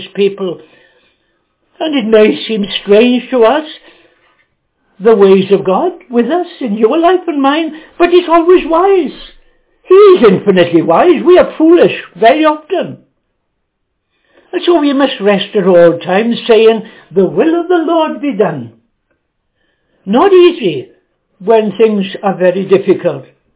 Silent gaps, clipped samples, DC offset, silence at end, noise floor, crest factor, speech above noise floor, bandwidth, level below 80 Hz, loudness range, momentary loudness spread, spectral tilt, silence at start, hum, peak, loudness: none; 1%; under 0.1%; 0.35 s; -67 dBFS; 10 dB; 58 dB; 4 kHz; -50 dBFS; 5 LU; 11 LU; -10.5 dB/octave; 0 s; none; 0 dBFS; -10 LUFS